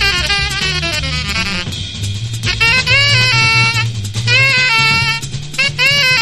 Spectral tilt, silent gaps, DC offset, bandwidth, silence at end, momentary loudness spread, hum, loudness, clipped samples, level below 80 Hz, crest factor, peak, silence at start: -2.5 dB/octave; none; under 0.1%; 13.5 kHz; 0 s; 11 LU; none; -12 LUFS; under 0.1%; -30 dBFS; 14 dB; 0 dBFS; 0 s